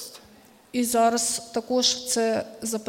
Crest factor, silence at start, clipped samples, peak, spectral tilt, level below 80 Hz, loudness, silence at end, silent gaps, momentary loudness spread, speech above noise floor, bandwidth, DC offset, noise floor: 16 dB; 0 s; under 0.1%; -10 dBFS; -2 dB/octave; -64 dBFS; -24 LUFS; 0 s; none; 9 LU; 28 dB; 16.5 kHz; under 0.1%; -53 dBFS